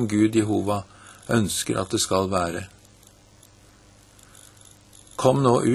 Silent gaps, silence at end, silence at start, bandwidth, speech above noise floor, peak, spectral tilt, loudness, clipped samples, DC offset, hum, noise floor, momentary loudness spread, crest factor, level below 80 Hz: none; 0 s; 0 s; 13.5 kHz; 31 dB; -2 dBFS; -5 dB/octave; -23 LUFS; under 0.1%; under 0.1%; 50 Hz at -55 dBFS; -53 dBFS; 18 LU; 22 dB; -54 dBFS